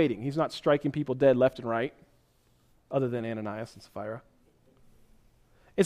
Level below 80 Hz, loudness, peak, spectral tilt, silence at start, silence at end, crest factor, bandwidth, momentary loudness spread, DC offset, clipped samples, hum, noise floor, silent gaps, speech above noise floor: -64 dBFS; -29 LUFS; -10 dBFS; -7 dB/octave; 0 s; 0 s; 20 dB; 13.5 kHz; 16 LU; under 0.1%; under 0.1%; none; -66 dBFS; none; 38 dB